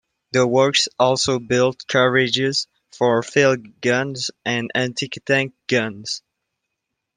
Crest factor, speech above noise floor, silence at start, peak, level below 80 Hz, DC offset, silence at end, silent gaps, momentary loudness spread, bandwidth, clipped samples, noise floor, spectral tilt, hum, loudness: 18 dB; 60 dB; 0.35 s; -2 dBFS; -60 dBFS; under 0.1%; 1 s; none; 9 LU; 10 kHz; under 0.1%; -79 dBFS; -4 dB/octave; none; -19 LUFS